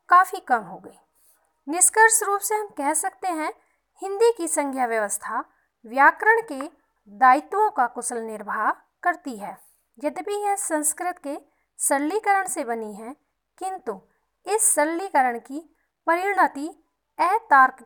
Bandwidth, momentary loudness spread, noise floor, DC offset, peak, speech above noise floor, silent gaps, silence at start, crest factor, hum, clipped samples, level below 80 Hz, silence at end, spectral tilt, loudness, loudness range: 19.5 kHz; 19 LU; -62 dBFS; under 0.1%; -4 dBFS; 40 dB; none; 0.1 s; 20 dB; none; under 0.1%; -74 dBFS; 0 s; -1 dB/octave; -22 LUFS; 5 LU